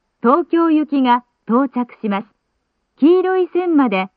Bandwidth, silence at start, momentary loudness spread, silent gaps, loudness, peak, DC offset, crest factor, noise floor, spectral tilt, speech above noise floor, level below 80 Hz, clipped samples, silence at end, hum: 4.8 kHz; 0.25 s; 9 LU; none; -16 LUFS; -2 dBFS; under 0.1%; 14 dB; -70 dBFS; -10 dB/octave; 55 dB; -70 dBFS; under 0.1%; 0.1 s; none